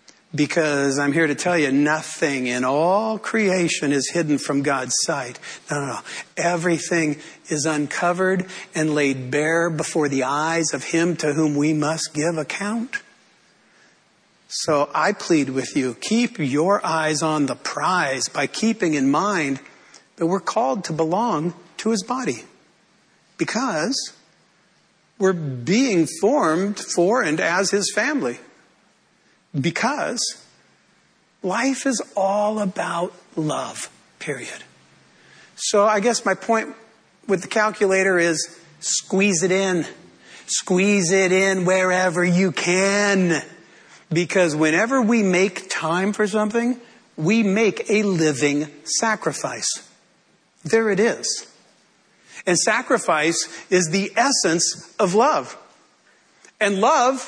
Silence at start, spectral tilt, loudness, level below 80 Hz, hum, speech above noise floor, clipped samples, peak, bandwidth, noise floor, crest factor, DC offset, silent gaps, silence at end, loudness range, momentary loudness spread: 0.35 s; -4 dB/octave; -21 LUFS; -70 dBFS; none; 40 dB; under 0.1%; -6 dBFS; 11 kHz; -60 dBFS; 16 dB; under 0.1%; none; 0 s; 6 LU; 10 LU